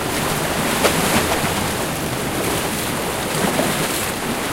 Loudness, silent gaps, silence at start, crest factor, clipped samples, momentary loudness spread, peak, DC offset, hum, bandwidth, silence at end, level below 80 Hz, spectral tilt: -19 LUFS; none; 0 s; 18 dB; under 0.1%; 5 LU; -2 dBFS; under 0.1%; none; 16 kHz; 0 s; -38 dBFS; -3.5 dB/octave